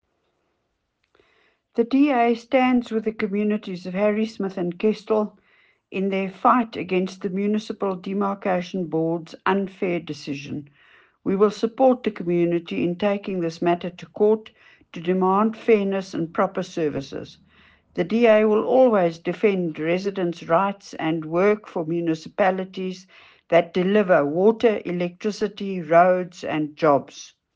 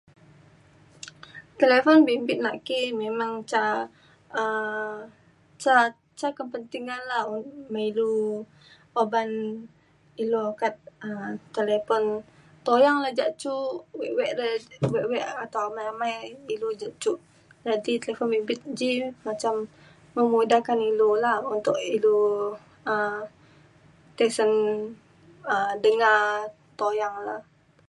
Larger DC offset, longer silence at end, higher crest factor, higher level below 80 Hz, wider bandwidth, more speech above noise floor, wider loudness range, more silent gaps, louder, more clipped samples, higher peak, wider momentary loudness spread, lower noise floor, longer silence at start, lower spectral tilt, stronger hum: neither; second, 0.3 s vs 0.45 s; about the same, 18 dB vs 20 dB; first, -64 dBFS vs -70 dBFS; second, 8 kHz vs 11.5 kHz; first, 52 dB vs 31 dB; about the same, 4 LU vs 6 LU; neither; first, -22 LUFS vs -26 LUFS; neither; about the same, -4 dBFS vs -6 dBFS; second, 12 LU vs 15 LU; first, -74 dBFS vs -55 dBFS; first, 1.75 s vs 1.05 s; first, -7 dB/octave vs -4.5 dB/octave; neither